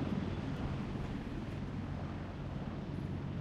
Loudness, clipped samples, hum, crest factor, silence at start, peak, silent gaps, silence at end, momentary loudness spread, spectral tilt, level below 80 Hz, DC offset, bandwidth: -41 LUFS; under 0.1%; none; 14 dB; 0 s; -26 dBFS; none; 0 s; 3 LU; -8 dB/octave; -50 dBFS; under 0.1%; 9.6 kHz